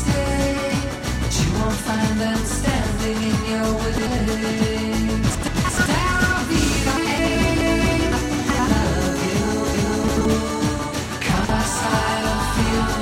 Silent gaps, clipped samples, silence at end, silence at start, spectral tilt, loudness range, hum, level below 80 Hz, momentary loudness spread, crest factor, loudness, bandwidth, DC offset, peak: none; under 0.1%; 0 s; 0 s; -4.5 dB/octave; 2 LU; none; -28 dBFS; 4 LU; 14 dB; -21 LUFS; 16.5 kHz; under 0.1%; -6 dBFS